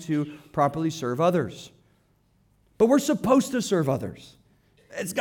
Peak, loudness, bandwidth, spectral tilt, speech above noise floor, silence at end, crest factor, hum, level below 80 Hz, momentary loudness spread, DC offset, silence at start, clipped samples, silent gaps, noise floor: -6 dBFS; -24 LUFS; 18.5 kHz; -6 dB/octave; 40 dB; 0 s; 20 dB; none; -60 dBFS; 13 LU; under 0.1%; 0 s; under 0.1%; none; -64 dBFS